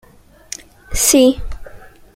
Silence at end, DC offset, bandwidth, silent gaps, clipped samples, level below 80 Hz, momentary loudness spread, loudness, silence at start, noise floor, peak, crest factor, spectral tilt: 0.4 s; under 0.1%; 16.5 kHz; none; under 0.1%; -32 dBFS; 23 LU; -13 LUFS; 0.9 s; -38 dBFS; 0 dBFS; 18 dB; -2.5 dB/octave